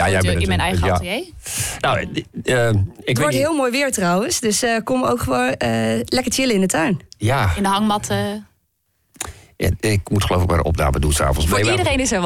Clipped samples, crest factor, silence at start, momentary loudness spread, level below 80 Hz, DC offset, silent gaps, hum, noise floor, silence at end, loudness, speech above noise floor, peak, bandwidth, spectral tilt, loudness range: under 0.1%; 10 dB; 0 s; 7 LU; -32 dBFS; under 0.1%; none; none; -67 dBFS; 0 s; -19 LUFS; 49 dB; -8 dBFS; 17 kHz; -4.5 dB/octave; 3 LU